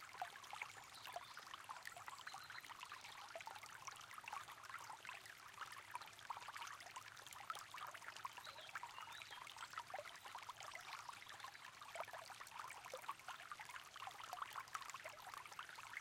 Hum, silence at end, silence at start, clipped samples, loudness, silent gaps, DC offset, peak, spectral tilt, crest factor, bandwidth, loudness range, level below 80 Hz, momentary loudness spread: none; 0 s; 0 s; under 0.1%; -53 LUFS; none; under 0.1%; -30 dBFS; -0.5 dB/octave; 24 dB; 16.5 kHz; 1 LU; -86 dBFS; 3 LU